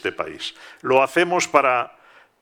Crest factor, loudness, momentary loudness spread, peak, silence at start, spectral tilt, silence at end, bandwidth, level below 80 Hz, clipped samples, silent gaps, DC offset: 20 dB; -19 LUFS; 15 LU; 0 dBFS; 0.05 s; -3.5 dB/octave; 0.55 s; 17.5 kHz; -66 dBFS; under 0.1%; none; under 0.1%